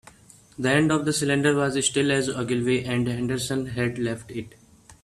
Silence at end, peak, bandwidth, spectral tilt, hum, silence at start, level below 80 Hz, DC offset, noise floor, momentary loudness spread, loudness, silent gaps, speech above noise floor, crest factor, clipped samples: 0.1 s; -6 dBFS; 14 kHz; -4.5 dB/octave; none; 0.6 s; -54 dBFS; under 0.1%; -51 dBFS; 8 LU; -24 LUFS; none; 27 dB; 18 dB; under 0.1%